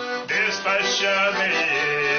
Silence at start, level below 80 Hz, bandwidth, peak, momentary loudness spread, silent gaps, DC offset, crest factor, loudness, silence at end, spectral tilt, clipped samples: 0 s; -62 dBFS; 6.8 kHz; -10 dBFS; 2 LU; none; under 0.1%; 12 dB; -20 LUFS; 0 s; 0.5 dB/octave; under 0.1%